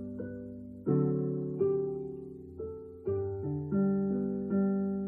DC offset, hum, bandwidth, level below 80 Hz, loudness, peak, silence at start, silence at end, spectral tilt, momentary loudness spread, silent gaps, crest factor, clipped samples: under 0.1%; none; 2.4 kHz; -60 dBFS; -33 LUFS; -16 dBFS; 0 s; 0 s; -14 dB/octave; 13 LU; none; 16 dB; under 0.1%